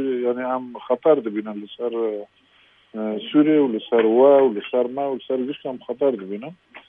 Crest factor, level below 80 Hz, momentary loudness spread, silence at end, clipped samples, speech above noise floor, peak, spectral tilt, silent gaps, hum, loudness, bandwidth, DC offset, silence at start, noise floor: 18 dB; -74 dBFS; 16 LU; 0.1 s; under 0.1%; 36 dB; -4 dBFS; -9 dB/octave; none; none; -21 LUFS; 3.8 kHz; under 0.1%; 0 s; -57 dBFS